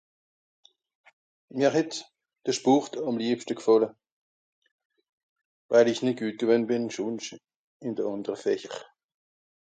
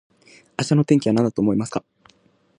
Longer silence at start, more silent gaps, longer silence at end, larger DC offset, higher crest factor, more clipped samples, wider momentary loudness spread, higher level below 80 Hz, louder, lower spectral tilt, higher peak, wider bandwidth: first, 1.55 s vs 0.6 s; first, 4.12-4.62 s, 4.71-4.79 s, 4.85-4.90 s, 5.09-5.36 s, 5.45-5.69 s, 7.56-7.80 s vs none; about the same, 0.9 s vs 0.8 s; neither; about the same, 22 dB vs 18 dB; neither; about the same, 14 LU vs 13 LU; second, -78 dBFS vs -58 dBFS; second, -27 LUFS vs -20 LUFS; second, -5 dB/octave vs -7 dB/octave; second, -8 dBFS vs -4 dBFS; second, 9.2 kHz vs 11 kHz